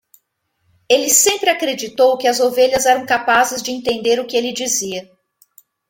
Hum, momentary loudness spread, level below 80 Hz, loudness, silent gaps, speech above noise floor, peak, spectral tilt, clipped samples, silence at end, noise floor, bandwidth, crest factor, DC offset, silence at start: none; 9 LU; -56 dBFS; -15 LUFS; none; 53 dB; 0 dBFS; -1 dB/octave; under 0.1%; 0.85 s; -68 dBFS; 17 kHz; 18 dB; under 0.1%; 0.9 s